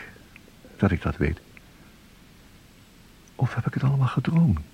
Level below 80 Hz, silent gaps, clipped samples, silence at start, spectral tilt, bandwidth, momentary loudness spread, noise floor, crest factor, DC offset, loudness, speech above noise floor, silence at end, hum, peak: -42 dBFS; none; under 0.1%; 0 s; -8.5 dB/octave; 10.5 kHz; 7 LU; -52 dBFS; 20 dB; under 0.1%; -25 LUFS; 29 dB; 0.1 s; none; -6 dBFS